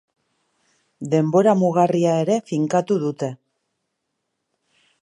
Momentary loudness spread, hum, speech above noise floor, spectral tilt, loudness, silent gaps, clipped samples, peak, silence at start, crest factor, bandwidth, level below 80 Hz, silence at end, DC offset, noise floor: 11 LU; none; 58 dB; -7 dB/octave; -20 LUFS; none; under 0.1%; -4 dBFS; 1 s; 18 dB; 11 kHz; -72 dBFS; 1.7 s; under 0.1%; -77 dBFS